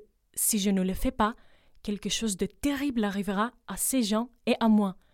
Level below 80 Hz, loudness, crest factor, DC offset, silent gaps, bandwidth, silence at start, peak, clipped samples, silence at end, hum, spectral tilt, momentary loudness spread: -46 dBFS; -28 LUFS; 18 dB; under 0.1%; none; 17 kHz; 0 s; -12 dBFS; under 0.1%; 0.2 s; none; -4 dB/octave; 9 LU